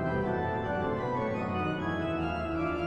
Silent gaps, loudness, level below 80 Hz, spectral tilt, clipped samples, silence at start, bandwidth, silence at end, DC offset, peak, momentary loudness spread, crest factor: none; -32 LUFS; -52 dBFS; -8 dB/octave; under 0.1%; 0 s; 9.2 kHz; 0 s; under 0.1%; -20 dBFS; 1 LU; 12 dB